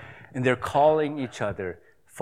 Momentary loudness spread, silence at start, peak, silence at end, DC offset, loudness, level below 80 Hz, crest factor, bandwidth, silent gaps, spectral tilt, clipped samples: 14 LU; 0 s; -8 dBFS; 0 s; 0.1%; -25 LUFS; -58 dBFS; 18 dB; 14 kHz; none; -6 dB/octave; under 0.1%